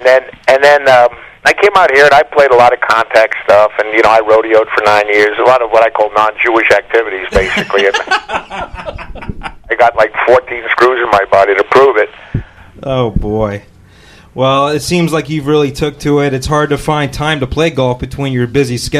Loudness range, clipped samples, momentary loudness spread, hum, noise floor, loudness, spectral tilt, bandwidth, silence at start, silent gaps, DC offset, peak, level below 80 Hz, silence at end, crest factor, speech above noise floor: 6 LU; under 0.1%; 12 LU; none; -39 dBFS; -10 LUFS; -5 dB/octave; 15 kHz; 0 s; none; under 0.1%; 0 dBFS; -32 dBFS; 0 s; 10 dB; 29 dB